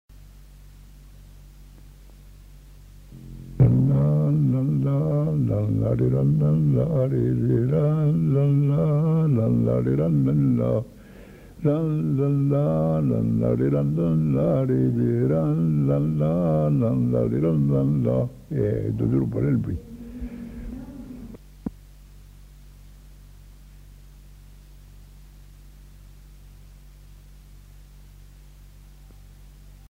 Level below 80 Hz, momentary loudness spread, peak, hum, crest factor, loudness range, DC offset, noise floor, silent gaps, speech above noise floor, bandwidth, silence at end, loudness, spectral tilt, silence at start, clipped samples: -44 dBFS; 17 LU; -4 dBFS; none; 18 dB; 9 LU; under 0.1%; -46 dBFS; none; 25 dB; 3.7 kHz; 0.2 s; -22 LUFS; -11 dB/octave; 0.8 s; under 0.1%